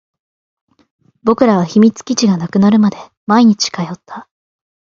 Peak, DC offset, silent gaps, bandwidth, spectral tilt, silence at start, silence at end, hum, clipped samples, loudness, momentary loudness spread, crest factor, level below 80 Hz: 0 dBFS; under 0.1%; 3.17-3.27 s; 7.4 kHz; -5.5 dB/octave; 1.25 s; 0.75 s; none; under 0.1%; -13 LUFS; 17 LU; 14 dB; -56 dBFS